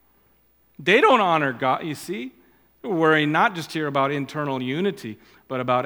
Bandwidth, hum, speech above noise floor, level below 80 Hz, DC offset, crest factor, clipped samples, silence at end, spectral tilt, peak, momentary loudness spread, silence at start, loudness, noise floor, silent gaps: 19 kHz; none; 40 dB; -68 dBFS; under 0.1%; 20 dB; under 0.1%; 0 s; -5.5 dB/octave; -2 dBFS; 16 LU; 0.8 s; -22 LUFS; -61 dBFS; none